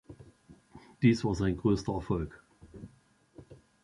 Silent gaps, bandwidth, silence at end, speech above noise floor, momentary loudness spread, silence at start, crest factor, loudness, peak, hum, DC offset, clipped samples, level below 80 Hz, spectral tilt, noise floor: none; 11.5 kHz; 0.3 s; 35 dB; 24 LU; 0.1 s; 22 dB; -30 LUFS; -12 dBFS; none; under 0.1%; under 0.1%; -50 dBFS; -7.5 dB/octave; -64 dBFS